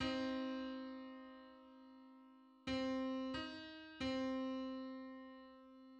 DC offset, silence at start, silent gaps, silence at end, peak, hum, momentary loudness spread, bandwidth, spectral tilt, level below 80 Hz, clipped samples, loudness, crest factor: under 0.1%; 0 s; none; 0 s; -30 dBFS; none; 20 LU; 8.6 kHz; -5 dB/octave; -70 dBFS; under 0.1%; -45 LUFS; 16 dB